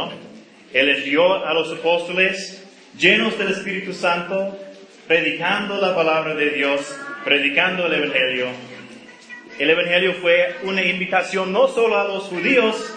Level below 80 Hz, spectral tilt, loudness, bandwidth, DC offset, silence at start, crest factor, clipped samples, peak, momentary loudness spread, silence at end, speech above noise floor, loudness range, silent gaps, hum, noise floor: -68 dBFS; -4 dB/octave; -18 LUFS; 10 kHz; under 0.1%; 0 s; 20 dB; under 0.1%; 0 dBFS; 13 LU; 0 s; 24 dB; 2 LU; none; none; -43 dBFS